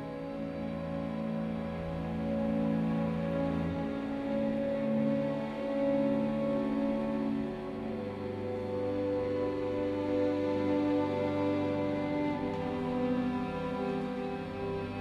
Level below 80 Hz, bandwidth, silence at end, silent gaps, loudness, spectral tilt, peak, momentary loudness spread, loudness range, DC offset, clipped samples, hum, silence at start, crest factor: -54 dBFS; 9.6 kHz; 0 s; none; -33 LUFS; -8.5 dB/octave; -18 dBFS; 7 LU; 2 LU; under 0.1%; under 0.1%; none; 0 s; 14 dB